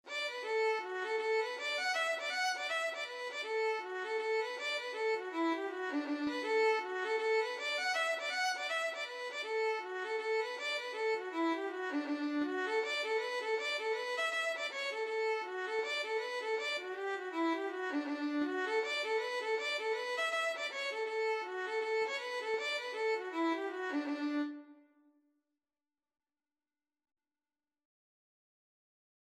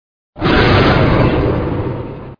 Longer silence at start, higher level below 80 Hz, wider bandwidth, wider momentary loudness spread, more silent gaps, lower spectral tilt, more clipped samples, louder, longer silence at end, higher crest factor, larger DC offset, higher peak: second, 0.05 s vs 0.35 s; second, under -90 dBFS vs -24 dBFS; first, 13 kHz vs 5.2 kHz; second, 4 LU vs 11 LU; neither; second, -1 dB/octave vs -8 dB/octave; neither; second, -36 LUFS vs -13 LUFS; first, 4.5 s vs 0.05 s; about the same, 14 dB vs 14 dB; neither; second, -22 dBFS vs 0 dBFS